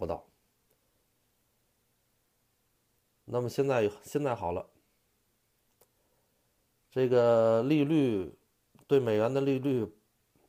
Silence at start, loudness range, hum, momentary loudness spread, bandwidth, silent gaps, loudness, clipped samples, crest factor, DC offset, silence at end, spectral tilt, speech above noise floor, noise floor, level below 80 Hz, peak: 0 s; 11 LU; none; 14 LU; 15.5 kHz; none; -29 LUFS; under 0.1%; 18 dB; under 0.1%; 0.6 s; -7.5 dB/octave; 47 dB; -74 dBFS; -66 dBFS; -14 dBFS